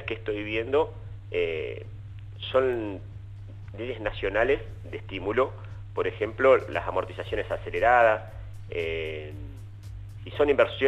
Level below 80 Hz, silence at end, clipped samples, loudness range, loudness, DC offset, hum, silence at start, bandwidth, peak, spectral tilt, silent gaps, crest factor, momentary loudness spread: -46 dBFS; 0 s; under 0.1%; 5 LU; -27 LUFS; under 0.1%; none; 0 s; 9 kHz; -8 dBFS; -7 dB/octave; none; 20 dB; 21 LU